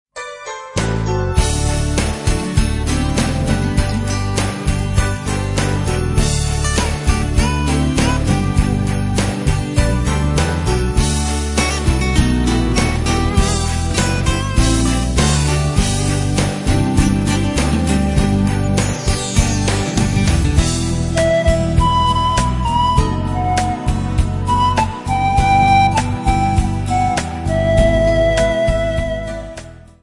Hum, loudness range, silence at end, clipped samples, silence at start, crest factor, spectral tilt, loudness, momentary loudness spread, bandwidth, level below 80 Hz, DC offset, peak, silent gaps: none; 3 LU; 0.25 s; under 0.1%; 0.15 s; 16 dB; -5 dB/octave; -16 LUFS; 5 LU; 11.5 kHz; -22 dBFS; under 0.1%; 0 dBFS; none